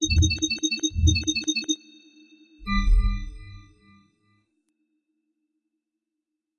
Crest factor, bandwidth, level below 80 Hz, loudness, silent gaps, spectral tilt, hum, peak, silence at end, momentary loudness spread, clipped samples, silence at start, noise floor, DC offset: 20 dB; 10 kHz; -30 dBFS; -24 LUFS; none; -3.5 dB/octave; none; -8 dBFS; 3 s; 15 LU; under 0.1%; 0 s; -84 dBFS; under 0.1%